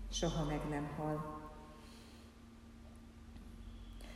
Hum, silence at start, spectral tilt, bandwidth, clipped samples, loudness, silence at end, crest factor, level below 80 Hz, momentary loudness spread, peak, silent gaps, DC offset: none; 0 s; -5 dB/octave; 14 kHz; under 0.1%; -42 LUFS; 0 s; 20 dB; -52 dBFS; 19 LU; -24 dBFS; none; under 0.1%